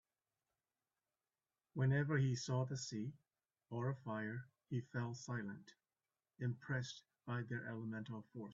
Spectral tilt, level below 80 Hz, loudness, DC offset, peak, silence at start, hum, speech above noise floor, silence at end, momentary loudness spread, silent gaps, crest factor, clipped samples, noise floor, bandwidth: -6.5 dB/octave; -78 dBFS; -44 LUFS; under 0.1%; -26 dBFS; 1.75 s; none; over 48 dB; 0 s; 13 LU; none; 18 dB; under 0.1%; under -90 dBFS; 7.6 kHz